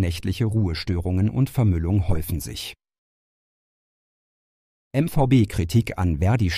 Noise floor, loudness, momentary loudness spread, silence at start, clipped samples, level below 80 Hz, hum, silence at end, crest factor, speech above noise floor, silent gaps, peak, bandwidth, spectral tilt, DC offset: under -90 dBFS; -23 LUFS; 10 LU; 0 s; under 0.1%; -36 dBFS; none; 0 s; 16 dB; over 69 dB; 2.98-4.91 s; -6 dBFS; 15.5 kHz; -7 dB/octave; under 0.1%